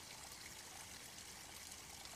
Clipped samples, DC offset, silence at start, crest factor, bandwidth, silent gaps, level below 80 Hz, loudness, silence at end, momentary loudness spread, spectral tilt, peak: under 0.1%; under 0.1%; 0 s; 20 dB; 15 kHz; none; -70 dBFS; -52 LUFS; 0 s; 1 LU; -1 dB/octave; -34 dBFS